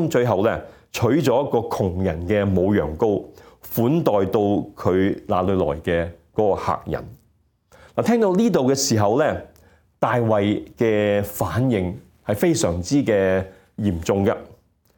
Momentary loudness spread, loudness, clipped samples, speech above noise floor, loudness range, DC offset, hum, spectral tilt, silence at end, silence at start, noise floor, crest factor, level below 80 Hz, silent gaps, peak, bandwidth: 8 LU; -21 LUFS; under 0.1%; 42 dB; 2 LU; under 0.1%; none; -6 dB/octave; 0.45 s; 0 s; -62 dBFS; 18 dB; -48 dBFS; none; -2 dBFS; 17.5 kHz